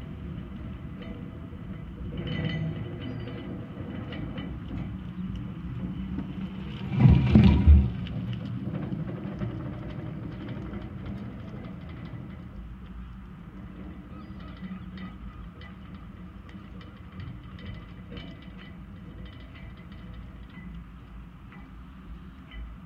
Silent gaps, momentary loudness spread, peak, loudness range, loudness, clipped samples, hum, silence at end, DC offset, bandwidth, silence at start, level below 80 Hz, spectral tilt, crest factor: none; 14 LU; -4 dBFS; 20 LU; -30 LUFS; under 0.1%; none; 0 s; under 0.1%; 5.4 kHz; 0 s; -36 dBFS; -9.5 dB/octave; 26 dB